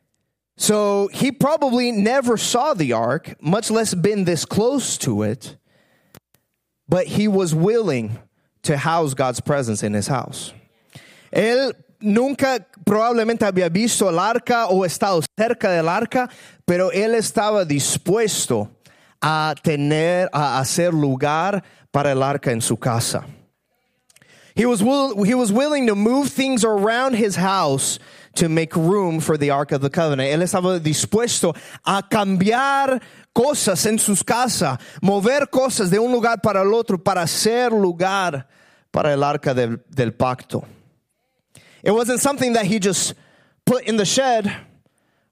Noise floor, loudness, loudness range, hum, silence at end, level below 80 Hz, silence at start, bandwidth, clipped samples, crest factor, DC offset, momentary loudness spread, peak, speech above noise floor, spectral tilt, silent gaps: -74 dBFS; -19 LUFS; 4 LU; none; 0.7 s; -60 dBFS; 0.6 s; 16 kHz; under 0.1%; 18 dB; under 0.1%; 6 LU; -2 dBFS; 55 dB; -4.5 dB/octave; none